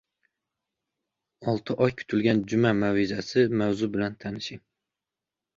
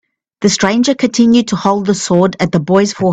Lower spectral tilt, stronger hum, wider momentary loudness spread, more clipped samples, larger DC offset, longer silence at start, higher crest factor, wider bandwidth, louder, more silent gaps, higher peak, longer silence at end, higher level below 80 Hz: first, -6.5 dB/octave vs -5 dB/octave; neither; first, 11 LU vs 4 LU; neither; neither; first, 1.4 s vs 0.4 s; first, 20 dB vs 12 dB; second, 7.8 kHz vs 9 kHz; second, -26 LUFS vs -12 LUFS; neither; second, -8 dBFS vs 0 dBFS; first, 1 s vs 0 s; second, -60 dBFS vs -48 dBFS